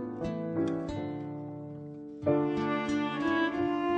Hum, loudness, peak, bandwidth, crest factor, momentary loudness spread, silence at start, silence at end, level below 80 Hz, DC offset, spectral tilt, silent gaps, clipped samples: none; -32 LUFS; -16 dBFS; 8.6 kHz; 16 dB; 13 LU; 0 s; 0 s; -60 dBFS; under 0.1%; -7 dB/octave; none; under 0.1%